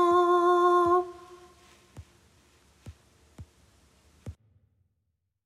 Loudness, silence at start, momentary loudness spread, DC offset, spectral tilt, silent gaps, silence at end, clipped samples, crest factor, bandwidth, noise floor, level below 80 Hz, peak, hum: -23 LUFS; 0 s; 26 LU; under 0.1%; -6 dB/octave; none; 1.15 s; under 0.1%; 18 dB; 10.5 kHz; -79 dBFS; -62 dBFS; -12 dBFS; none